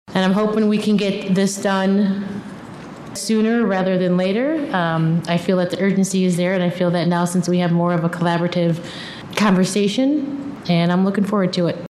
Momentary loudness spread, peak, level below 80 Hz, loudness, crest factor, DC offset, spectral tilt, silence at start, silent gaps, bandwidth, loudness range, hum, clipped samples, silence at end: 10 LU; -2 dBFS; -58 dBFS; -18 LUFS; 16 dB; under 0.1%; -6 dB/octave; 0.1 s; none; 13 kHz; 1 LU; none; under 0.1%; 0 s